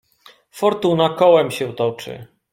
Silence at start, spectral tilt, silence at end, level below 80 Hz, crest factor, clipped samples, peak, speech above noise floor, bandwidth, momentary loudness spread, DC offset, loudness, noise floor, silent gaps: 0.55 s; -6 dB/octave; 0.3 s; -60 dBFS; 18 dB; under 0.1%; 0 dBFS; 33 dB; 16.5 kHz; 19 LU; under 0.1%; -17 LUFS; -51 dBFS; none